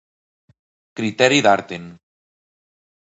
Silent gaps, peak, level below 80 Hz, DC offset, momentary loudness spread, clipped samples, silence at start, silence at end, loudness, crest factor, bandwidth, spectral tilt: none; -2 dBFS; -64 dBFS; under 0.1%; 19 LU; under 0.1%; 0.95 s; 1.2 s; -17 LUFS; 22 dB; 8 kHz; -4 dB/octave